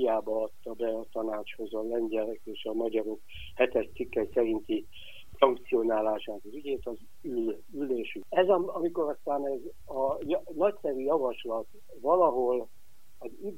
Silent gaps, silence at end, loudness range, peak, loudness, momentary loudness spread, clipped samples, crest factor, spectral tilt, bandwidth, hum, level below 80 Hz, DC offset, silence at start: none; 0 s; 3 LU; -6 dBFS; -31 LUFS; 14 LU; under 0.1%; 24 dB; -6.5 dB/octave; 16 kHz; none; -60 dBFS; 0.8%; 0 s